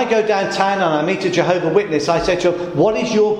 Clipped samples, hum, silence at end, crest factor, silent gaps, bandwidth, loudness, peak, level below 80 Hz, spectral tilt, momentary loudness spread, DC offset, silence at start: under 0.1%; none; 0 s; 14 dB; none; 10 kHz; -17 LUFS; -2 dBFS; -46 dBFS; -5 dB/octave; 2 LU; under 0.1%; 0 s